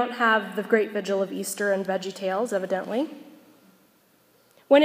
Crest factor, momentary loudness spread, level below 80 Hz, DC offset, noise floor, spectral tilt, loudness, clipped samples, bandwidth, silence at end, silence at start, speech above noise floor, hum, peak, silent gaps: 20 dB; 8 LU; -84 dBFS; under 0.1%; -61 dBFS; -4 dB/octave; -26 LUFS; under 0.1%; 15.5 kHz; 0 s; 0 s; 36 dB; none; -4 dBFS; none